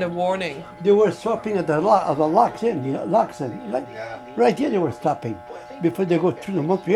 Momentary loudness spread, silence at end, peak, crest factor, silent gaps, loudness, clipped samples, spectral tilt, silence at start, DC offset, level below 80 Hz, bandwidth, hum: 12 LU; 0 s; -2 dBFS; 18 dB; none; -22 LUFS; under 0.1%; -7 dB/octave; 0 s; under 0.1%; -60 dBFS; 13 kHz; none